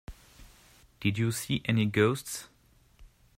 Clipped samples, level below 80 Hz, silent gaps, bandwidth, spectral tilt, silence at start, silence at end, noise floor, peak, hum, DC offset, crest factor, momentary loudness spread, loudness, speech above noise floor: under 0.1%; -56 dBFS; none; 16 kHz; -5.5 dB/octave; 0.1 s; 0.3 s; -59 dBFS; -10 dBFS; none; under 0.1%; 22 dB; 14 LU; -29 LUFS; 31 dB